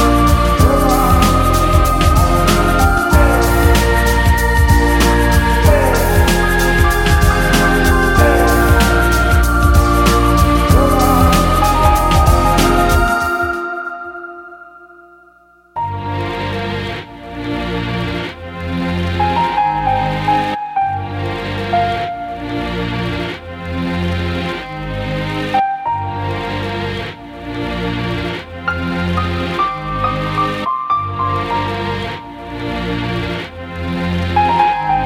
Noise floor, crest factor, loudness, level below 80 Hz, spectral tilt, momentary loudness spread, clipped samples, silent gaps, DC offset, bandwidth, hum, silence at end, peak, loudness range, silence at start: -48 dBFS; 14 dB; -15 LUFS; -20 dBFS; -5.5 dB/octave; 12 LU; under 0.1%; none; under 0.1%; 17 kHz; none; 0 s; 0 dBFS; 9 LU; 0 s